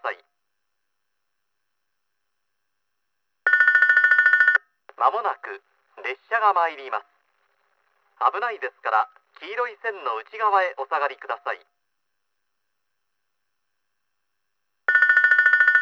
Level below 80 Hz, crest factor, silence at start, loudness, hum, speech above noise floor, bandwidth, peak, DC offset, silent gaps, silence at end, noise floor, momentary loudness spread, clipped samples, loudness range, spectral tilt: under -90 dBFS; 20 dB; 0.05 s; -20 LUFS; none; 54 dB; 7 kHz; -4 dBFS; under 0.1%; none; 0 s; -80 dBFS; 17 LU; under 0.1%; 10 LU; 0 dB/octave